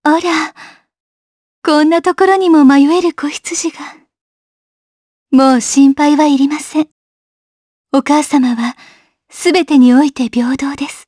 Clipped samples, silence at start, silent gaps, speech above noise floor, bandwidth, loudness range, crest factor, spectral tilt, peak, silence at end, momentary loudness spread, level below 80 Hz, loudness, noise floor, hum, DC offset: under 0.1%; 0.05 s; 1.00-1.62 s, 4.21-5.26 s, 6.91-7.84 s; 28 dB; 11 kHz; 3 LU; 12 dB; -3 dB/octave; 0 dBFS; 0.1 s; 12 LU; -56 dBFS; -11 LUFS; -39 dBFS; none; under 0.1%